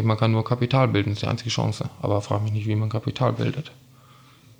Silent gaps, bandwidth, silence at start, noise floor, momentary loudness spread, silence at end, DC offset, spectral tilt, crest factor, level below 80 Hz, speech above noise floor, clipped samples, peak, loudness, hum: none; 10 kHz; 0 s; -51 dBFS; 7 LU; 0.9 s; under 0.1%; -6.5 dB/octave; 16 dB; -58 dBFS; 28 dB; under 0.1%; -8 dBFS; -24 LUFS; none